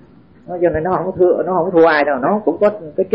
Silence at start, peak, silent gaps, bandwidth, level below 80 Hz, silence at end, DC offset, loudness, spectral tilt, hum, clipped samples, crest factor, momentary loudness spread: 0.5 s; -2 dBFS; none; 5.6 kHz; -46 dBFS; 0 s; 0.2%; -15 LUFS; -5 dB/octave; none; under 0.1%; 14 dB; 7 LU